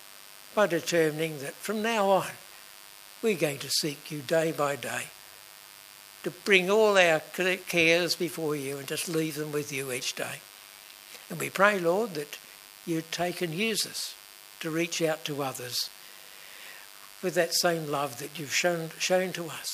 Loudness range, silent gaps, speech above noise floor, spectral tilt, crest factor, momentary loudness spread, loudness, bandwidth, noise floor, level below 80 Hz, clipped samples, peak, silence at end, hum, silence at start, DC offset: 7 LU; none; 21 dB; -3 dB/octave; 24 dB; 23 LU; -28 LUFS; 15.5 kHz; -50 dBFS; -74 dBFS; under 0.1%; -6 dBFS; 0 s; none; 0 s; under 0.1%